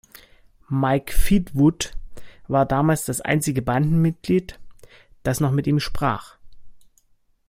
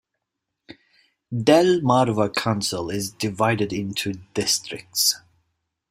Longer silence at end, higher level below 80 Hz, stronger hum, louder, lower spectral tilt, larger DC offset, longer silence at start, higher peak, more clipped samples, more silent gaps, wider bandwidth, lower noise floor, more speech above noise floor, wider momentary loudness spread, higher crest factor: about the same, 0.7 s vs 0.75 s; first, -32 dBFS vs -60 dBFS; neither; about the same, -22 LUFS vs -22 LUFS; first, -6 dB/octave vs -4 dB/octave; neither; about the same, 0.7 s vs 0.7 s; second, -6 dBFS vs -2 dBFS; neither; neither; about the same, 16.5 kHz vs 16 kHz; second, -61 dBFS vs -81 dBFS; second, 41 dB vs 60 dB; about the same, 9 LU vs 11 LU; about the same, 16 dB vs 20 dB